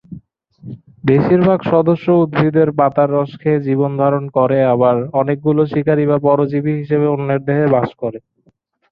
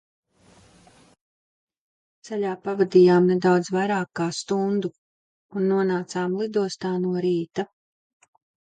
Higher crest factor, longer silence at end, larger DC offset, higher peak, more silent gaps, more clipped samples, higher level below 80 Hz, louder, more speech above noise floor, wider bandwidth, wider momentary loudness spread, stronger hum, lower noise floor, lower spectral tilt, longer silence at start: about the same, 14 dB vs 18 dB; second, 0.75 s vs 1 s; neither; first, -2 dBFS vs -6 dBFS; second, none vs 4.98-5.49 s; neither; first, -52 dBFS vs -70 dBFS; first, -15 LUFS vs -23 LUFS; first, 44 dB vs 34 dB; second, 5.4 kHz vs 9.2 kHz; second, 5 LU vs 13 LU; neither; about the same, -58 dBFS vs -56 dBFS; first, -11.5 dB/octave vs -6.5 dB/octave; second, 0.1 s vs 2.25 s